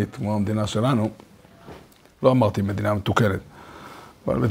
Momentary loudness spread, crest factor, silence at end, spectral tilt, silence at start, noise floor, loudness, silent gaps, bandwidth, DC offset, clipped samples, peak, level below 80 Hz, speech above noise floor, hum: 22 LU; 22 dB; 0 s; -7 dB/octave; 0 s; -46 dBFS; -23 LUFS; none; 16 kHz; under 0.1%; under 0.1%; -2 dBFS; -50 dBFS; 25 dB; none